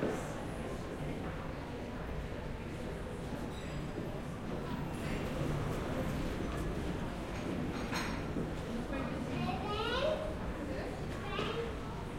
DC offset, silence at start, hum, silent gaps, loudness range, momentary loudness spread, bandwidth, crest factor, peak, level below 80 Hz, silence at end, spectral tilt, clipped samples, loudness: under 0.1%; 0 s; none; none; 5 LU; 6 LU; 16.5 kHz; 16 dB; -22 dBFS; -46 dBFS; 0 s; -6 dB/octave; under 0.1%; -39 LUFS